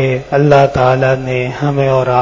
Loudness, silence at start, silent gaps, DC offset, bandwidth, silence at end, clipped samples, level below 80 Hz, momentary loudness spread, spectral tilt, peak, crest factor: -12 LUFS; 0 s; none; under 0.1%; 7.6 kHz; 0 s; 0.2%; -38 dBFS; 7 LU; -7.5 dB/octave; 0 dBFS; 12 dB